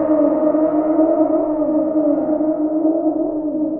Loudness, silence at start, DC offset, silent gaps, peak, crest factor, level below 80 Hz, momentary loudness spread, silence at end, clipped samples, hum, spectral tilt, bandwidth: -17 LUFS; 0 s; under 0.1%; none; -4 dBFS; 12 dB; -52 dBFS; 4 LU; 0 s; under 0.1%; none; -10.5 dB/octave; 2.3 kHz